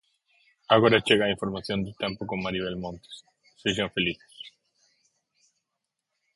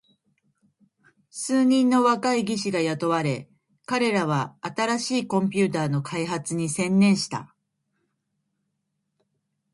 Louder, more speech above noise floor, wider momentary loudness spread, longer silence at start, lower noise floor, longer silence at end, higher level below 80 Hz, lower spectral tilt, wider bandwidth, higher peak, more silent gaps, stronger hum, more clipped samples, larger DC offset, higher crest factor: about the same, -26 LUFS vs -24 LUFS; about the same, 58 dB vs 55 dB; first, 25 LU vs 9 LU; second, 0.7 s vs 1.35 s; first, -84 dBFS vs -78 dBFS; second, 1.85 s vs 2.3 s; first, -58 dBFS vs -68 dBFS; about the same, -5 dB/octave vs -5 dB/octave; about the same, 11.5 kHz vs 11.5 kHz; first, -4 dBFS vs -8 dBFS; neither; neither; neither; neither; first, 24 dB vs 18 dB